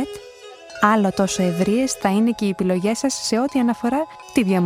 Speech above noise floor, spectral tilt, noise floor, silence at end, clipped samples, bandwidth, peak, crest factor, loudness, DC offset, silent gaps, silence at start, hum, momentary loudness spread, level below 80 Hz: 21 dB; -5 dB/octave; -41 dBFS; 0 s; under 0.1%; 16 kHz; 0 dBFS; 20 dB; -20 LUFS; under 0.1%; none; 0 s; none; 11 LU; -54 dBFS